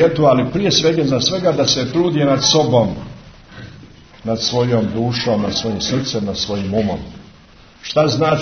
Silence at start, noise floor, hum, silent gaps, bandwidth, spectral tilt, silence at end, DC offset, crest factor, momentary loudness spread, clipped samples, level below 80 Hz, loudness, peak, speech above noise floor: 0 s; -44 dBFS; none; none; 6.6 kHz; -5 dB/octave; 0 s; under 0.1%; 16 dB; 16 LU; under 0.1%; -44 dBFS; -16 LUFS; 0 dBFS; 28 dB